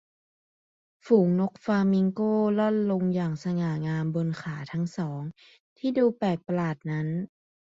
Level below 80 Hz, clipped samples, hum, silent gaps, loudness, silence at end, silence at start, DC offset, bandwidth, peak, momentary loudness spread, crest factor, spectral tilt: -66 dBFS; under 0.1%; none; 5.60-5.76 s; -27 LUFS; 0.45 s; 1.05 s; under 0.1%; 7.6 kHz; -8 dBFS; 10 LU; 18 dB; -8.5 dB/octave